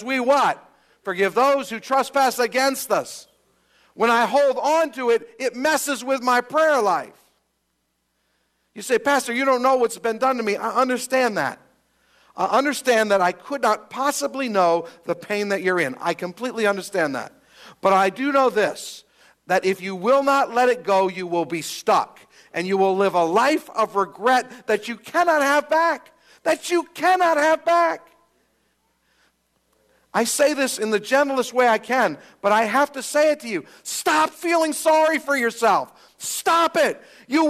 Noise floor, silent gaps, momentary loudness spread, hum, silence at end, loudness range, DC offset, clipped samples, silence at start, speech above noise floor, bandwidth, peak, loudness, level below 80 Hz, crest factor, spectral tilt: -72 dBFS; none; 9 LU; none; 0 s; 3 LU; under 0.1%; under 0.1%; 0 s; 52 dB; 15 kHz; -6 dBFS; -21 LUFS; -72 dBFS; 16 dB; -3 dB/octave